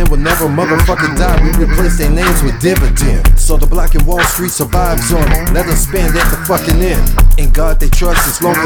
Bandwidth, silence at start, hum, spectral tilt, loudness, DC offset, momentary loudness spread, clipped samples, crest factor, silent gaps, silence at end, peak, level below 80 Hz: 19.5 kHz; 0 s; none; -4.5 dB/octave; -12 LUFS; under 0.1%; 2 LU; under 0.1%; 8 dB; none; 0 s; 0 dBFS; -10 dBFS